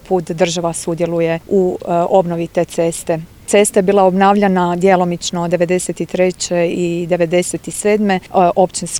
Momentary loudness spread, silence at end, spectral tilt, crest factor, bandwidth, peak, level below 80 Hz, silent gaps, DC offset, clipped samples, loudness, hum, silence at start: 7 LU; 0 s; -5 dB/octave; 14 dB; 18 kHz; 0 dBFS; -48 dBFS; none; under 0.1%; under 0.1%; -15 LUFS; none; 0.05 s